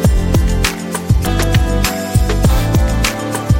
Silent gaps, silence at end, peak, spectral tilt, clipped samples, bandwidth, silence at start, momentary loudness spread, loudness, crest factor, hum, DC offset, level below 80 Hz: none; 0 s; 0 dBFS; -5 dB/octave; under 0.1%; 17 kHz; 0 s; 3 LU; -15 LUFS; 12 dB; none; under 0.1%; -16 dBFS